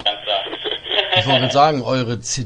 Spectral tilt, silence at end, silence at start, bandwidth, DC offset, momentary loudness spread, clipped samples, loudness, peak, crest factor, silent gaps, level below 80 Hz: -3.5 dB/octave; 0 s; 0 s; 10.5 kHz; under 0.1%; 7 LU; under 0.1%; -17 LUFS; 0 dBFS; 18 dB; none; -50 dBFS